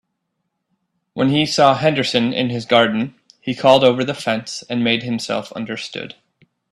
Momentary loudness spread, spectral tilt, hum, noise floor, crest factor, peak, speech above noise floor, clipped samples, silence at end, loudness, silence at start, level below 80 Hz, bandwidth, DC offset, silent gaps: 14 LU; -5 dB/octave; none; -74 dBFS; 18 dB; 0 dBFS; 57 dB; under 0.1%; 0.65 s; -17 LUFS; 1.15 s; -58 dBFS; 12.5 kHz; under 0.1%; none